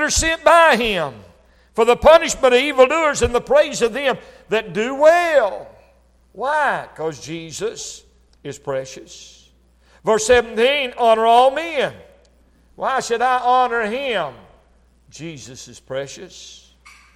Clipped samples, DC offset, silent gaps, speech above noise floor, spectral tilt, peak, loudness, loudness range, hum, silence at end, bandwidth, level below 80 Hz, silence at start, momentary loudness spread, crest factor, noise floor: under 0.1%; under 0.1%; none; 37 dB; -3 dB/octave; 0 dBFS; -17 LUFS; 10 LU; none; 0.65 s; 14.5 kHz; -42 dBFS; 0 s; 21 LU; 18 dB; -54 dBFS